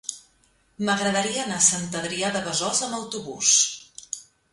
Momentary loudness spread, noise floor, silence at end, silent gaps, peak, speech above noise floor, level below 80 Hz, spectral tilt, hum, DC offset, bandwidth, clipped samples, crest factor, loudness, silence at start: 17 LU; -63 dBFS; 0.3 s; none; -6 dBFS; 39 dB; -64 dBFS; -1.5 dB/octave; none; under 0.1%; 11.5 kHz; under 0.1%; 20 dB; -22 LUFS; 0.1 s